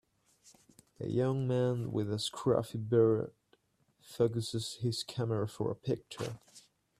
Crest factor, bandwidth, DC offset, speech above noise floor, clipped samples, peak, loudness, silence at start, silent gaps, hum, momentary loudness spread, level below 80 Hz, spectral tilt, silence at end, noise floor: 18 dB; 14 kHz; under 0.1%; 40 dB; under 0.1%; -16 dBFS; -34 LUFS; 1 s; none; none; 12 LU; -68 dBFS; -6.5 dB/octave; 0.4 s; -72 dBFS